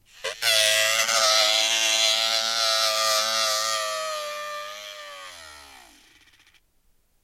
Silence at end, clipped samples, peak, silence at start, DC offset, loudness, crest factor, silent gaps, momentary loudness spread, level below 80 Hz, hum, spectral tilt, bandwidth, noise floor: 1.55 s; under 0.1%; -6 dBFS; 0.2 s; under 0.1%; -20 LUFS; 20 dB; none; 19 LU; -68 dBFS; none; 2.5 dB/octave; 16.5 kHz; -64 dBFS